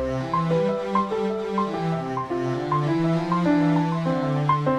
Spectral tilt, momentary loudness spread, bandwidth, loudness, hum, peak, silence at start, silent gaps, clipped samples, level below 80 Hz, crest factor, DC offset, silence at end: -8 dB/octave; 6 LU; 9.4 kHz; -24 LUFS; none; -8 dBFS; 0 s; none; under 0.1%; -50 dBFS; 16 dB; under 0.1%; 0 s